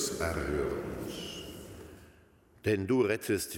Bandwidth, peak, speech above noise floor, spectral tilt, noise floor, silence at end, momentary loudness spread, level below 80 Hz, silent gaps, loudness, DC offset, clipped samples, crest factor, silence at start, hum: 17 kHz; -14 dBFS; 31 dB; -4.5 dB/octave; -61 dBFS; 0 s; 19 LU; -50 dBFS; none; -33 LUFS; under 0.1%; under 0.1%; 18 dB; 0 s; none